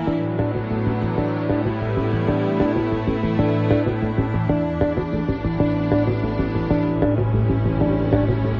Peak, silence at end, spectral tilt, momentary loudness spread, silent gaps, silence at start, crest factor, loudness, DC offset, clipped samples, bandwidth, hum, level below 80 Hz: -2 dBFS; 0 s; -10.5 dB/octave; 4 LU; none; 0 s; 18 dB; -21 LUFS; under 0.1%; under 0.1%; 5.6 kHz; none; -34 dBFS